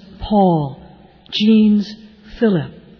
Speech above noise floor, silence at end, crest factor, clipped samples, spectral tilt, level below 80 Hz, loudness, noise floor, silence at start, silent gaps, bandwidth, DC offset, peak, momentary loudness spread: 29 dB; 0.3 s; 14 dB; under 0.1%; -8 dB/octave; -42 dBFS; -16 LUFS; -43 dBFS; 0.2 s; none; 5.4 kHz; under 0.1%; -4 dBFS; 12 LU